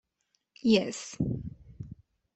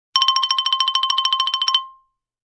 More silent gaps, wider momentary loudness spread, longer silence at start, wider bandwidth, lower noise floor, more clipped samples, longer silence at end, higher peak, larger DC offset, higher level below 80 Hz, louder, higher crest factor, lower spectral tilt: neither; first, 21 LU vs 3 LU; first, 0.65 s vs 0.15 s; second, 8.4 kHz vs 10 kHz; first, -78 dBFS vs -58 dBFS; neither; second, 0.4 s vs 0.55 s; second, -12 dBFS vs -2 dBFS; neither; first, -54 dBFS vs -74 dBFS; second, -30 LUFS vs -17 LUFS; about the same, 20 dB vs 20 dB; first, -5.5 dB/octave vs 4.5 dB/octave